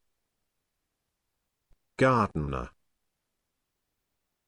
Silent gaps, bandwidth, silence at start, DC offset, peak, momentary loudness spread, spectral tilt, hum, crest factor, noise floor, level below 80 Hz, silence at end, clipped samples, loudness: none; 11 kHz; 2 s; under 0.1%; -12 dBFS; 21 LU; -7 dB/octave; none; 22 dB; -82 dBFS; -50 dBFS; 1.8 s; under 0.1%; -27 LUFS